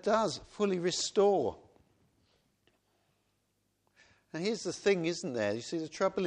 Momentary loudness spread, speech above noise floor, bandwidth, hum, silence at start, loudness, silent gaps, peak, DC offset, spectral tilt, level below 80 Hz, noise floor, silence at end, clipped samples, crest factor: 9 LU; 46 dB; 10 kHz; 50 Hz at -65 dBFS; 0.05 s; -32 LUFS; none; -14 dBFS; under 0.1%; -4 dB/octave; -70 dBFS; -78 dBFS; 0 s; under 0.1%; 20 dB